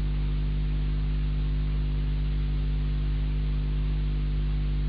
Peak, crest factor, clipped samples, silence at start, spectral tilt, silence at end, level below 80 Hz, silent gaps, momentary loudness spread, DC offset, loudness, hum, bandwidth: -20 dBFS; 6 dB; under 0.1%; 0 s; -10 dB/octave; 0 s; -26 dBFS; none; 0 LU; under 0.1%; -30 LUFS; 50 Hz at -25 dBFS; 4.9 kHz